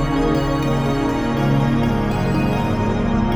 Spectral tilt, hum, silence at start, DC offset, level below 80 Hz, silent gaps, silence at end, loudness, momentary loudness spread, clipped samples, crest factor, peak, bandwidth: -7.5 dB/octave; none; 0 s; under 0.1%; -28 dBFS; none; 0 s; -19 LUFS; 2 LU; under 0.1%; 12 dB; -6 dBFS; 16 kHz